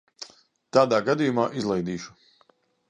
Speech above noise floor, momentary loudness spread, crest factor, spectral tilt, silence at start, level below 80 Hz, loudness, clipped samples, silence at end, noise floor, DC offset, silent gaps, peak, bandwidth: 41 dB; 21 LU; 22 dB; -6 dB/octave; 0.2 s; -64 dBFS; -24 LUFS; under 0.1%; 0.8 s; -64 dBFS; under 0.1%; none; -4 dBFS; 9.8 kHz